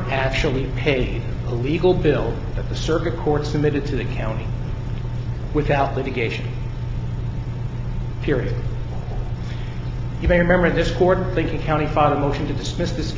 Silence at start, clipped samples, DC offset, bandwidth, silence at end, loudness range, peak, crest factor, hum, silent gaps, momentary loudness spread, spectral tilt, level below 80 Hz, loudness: 0 s; under 0.1%; under 0.1%; 7.6 kHz; 0 s; 6 LU; -4 dBFS; 18 dB; none; none; 10 LU; -7 dB/octave; -30 dBFS; -22 LUFS